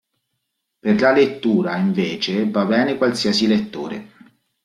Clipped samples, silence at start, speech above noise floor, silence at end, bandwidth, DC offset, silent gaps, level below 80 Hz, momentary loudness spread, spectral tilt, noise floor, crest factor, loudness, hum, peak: under 0.1%; 0.85 s; 57 dB; 0.6 s; 11 kHz; under 0.1%; none; -60 dBFS; 12 LU; -5.5 dB/octave; -75 dBFS; 16 dB; -18 LUFS; none; -2 dBFS